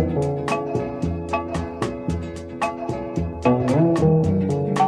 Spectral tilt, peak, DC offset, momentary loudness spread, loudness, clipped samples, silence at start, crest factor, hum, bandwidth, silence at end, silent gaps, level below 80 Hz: -7.5 dB/octave; -6 dBFS; under 0.1%; 10 LU; -23 LUFS; under 0.1%; 0 s; 16 dB; none; 11 kHz; 0 s; none; -40 dBFS